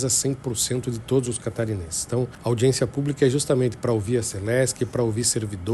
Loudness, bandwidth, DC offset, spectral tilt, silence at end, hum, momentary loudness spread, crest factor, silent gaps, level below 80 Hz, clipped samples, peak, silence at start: -24 LUFS; 12.5 kHz; under 0.1%; -4.5 dB/octave; 0 s; none; 6 LU; 18 dB; none; -50 dBFS; under 0.1%; -6 dBFS; 0 s